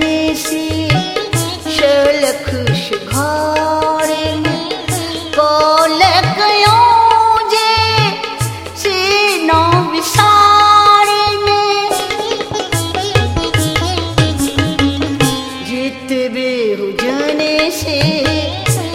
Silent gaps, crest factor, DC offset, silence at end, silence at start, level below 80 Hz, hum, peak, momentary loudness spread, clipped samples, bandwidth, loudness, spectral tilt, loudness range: none; 12 dB; under 0.1%; 0 s; 0 s; -36 dBFS; none; 0 dBFS; 10 LU; under 0.1%; 17 kHz; -12 LUFS; -4 dB/octave; 6 LU